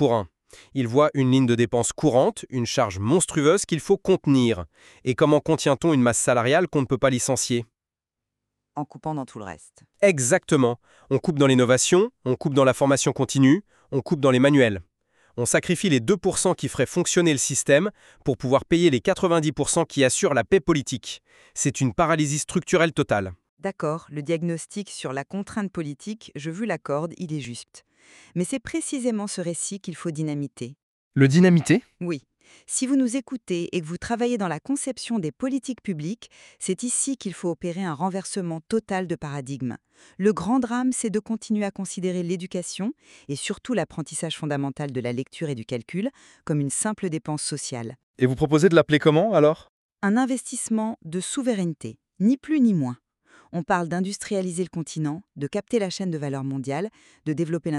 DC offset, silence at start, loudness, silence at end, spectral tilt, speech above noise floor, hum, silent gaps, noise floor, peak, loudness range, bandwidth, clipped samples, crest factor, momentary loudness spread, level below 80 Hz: under 0.1%; 0 s; -23 LUFS; 0 s; -5 dB/octave; 65 dB; none; 23.49-23.57 s, 30.83-31.11 s, 48.03-48.14 s, 49.69-49.89 s; -89 dBFS; -4 dBFS; 8 LU; 13 kHz; under 0.1%; 20 dB; 13 LU; -56 dBFS